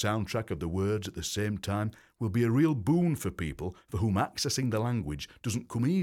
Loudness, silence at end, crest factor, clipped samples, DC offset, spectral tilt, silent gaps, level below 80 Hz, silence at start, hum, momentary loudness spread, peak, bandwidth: -31 LUFS; 0 s; 14 dB; under 0.1%; under 0.1%; -6 dB/octave; none; -52 dBFS; 0 s; none; 10 LU; -16 dBFS; 17 kHz